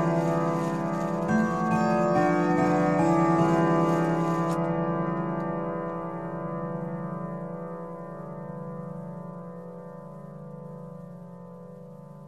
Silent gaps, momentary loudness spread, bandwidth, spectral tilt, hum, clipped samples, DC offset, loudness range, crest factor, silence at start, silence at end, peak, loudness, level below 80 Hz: none; 20 LU; 11.5 kHz; -8 dB/octave; 50 Hz at -45 dBFS; under 0.1%; 0.2%; 16 LU; 16 dB; 0 s; 0 s; -10 dBFS; -26 LUFS; -58 dBFS